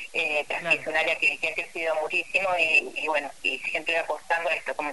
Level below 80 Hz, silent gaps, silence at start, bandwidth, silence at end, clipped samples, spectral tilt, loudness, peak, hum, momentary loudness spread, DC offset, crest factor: -66 dBFS; none; 0 s; 11.5 kHz; 0 s; under 0.1%; -2 dB/octave; -25 LUFS; -10 dBFS; none; 7 LU; 0.4%; 18 dB